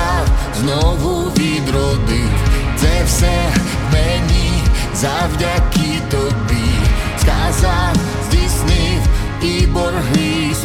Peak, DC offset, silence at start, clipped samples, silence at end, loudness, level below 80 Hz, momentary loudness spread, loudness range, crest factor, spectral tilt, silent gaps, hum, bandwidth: -2 dBFS; under 0.1%; 0 s; under 0.1%; 0 s; -16 LUFS; -18 dBFS; 3 LU; 1 LU; 12 dB; -5 dB/octave; none; none; 17 kHz